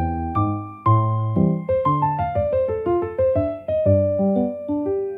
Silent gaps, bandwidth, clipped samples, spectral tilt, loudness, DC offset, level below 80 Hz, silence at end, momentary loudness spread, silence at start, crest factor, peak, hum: none; 3.8 kHz; under 0.1%; -12 dB/octave; -21 LUFS; under 0.1%; -44 dBFS; 0 s; 5 LU; 0 s; 16 dB; -4 dBFS; none